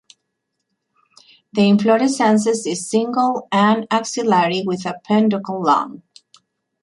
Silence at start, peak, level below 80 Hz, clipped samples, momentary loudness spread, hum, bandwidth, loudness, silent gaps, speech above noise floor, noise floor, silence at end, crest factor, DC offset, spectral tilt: 1.55 s; -2 dBFS; -64 dBFS; under 0.1%; 7 LU; none; 11.5 kHz; -17 LUFS; none; 58 dB; -75 dBFS; 0.85 s; 16 dB; under 0.1%; -5 dB/octave